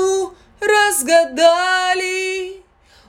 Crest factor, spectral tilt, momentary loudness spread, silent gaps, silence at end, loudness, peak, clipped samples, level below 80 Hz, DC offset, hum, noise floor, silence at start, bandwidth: 16 dB; -0.5 dB/octave; 12 LU; none; 0.5 s; -16 LUFS; -2 dBFS; under 0.1%; -56 dBFS; under 0.1%; none; -49 dBFS; 0 s; 17 kHz